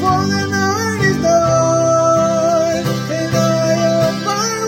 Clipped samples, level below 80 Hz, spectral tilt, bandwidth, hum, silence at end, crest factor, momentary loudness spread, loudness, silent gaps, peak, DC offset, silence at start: under 0.1%; -44 dBFS; -5 dB/octave; 16.5 kHz; none; 0 s; 12 dB; 5 LU; -15 LUFS; none; -2 dBFS; under 0.1%; 0 s